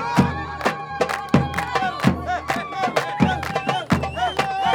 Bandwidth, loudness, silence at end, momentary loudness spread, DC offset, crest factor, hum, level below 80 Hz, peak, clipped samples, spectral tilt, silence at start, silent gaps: 18.5 kHz; -22 LUFS; 0 s; 4 LU; under 0.1%; 20 dB; none; -46 dBFS; -2 dBFS; under 0.1%; -5.5 dB/octave; 0 s; none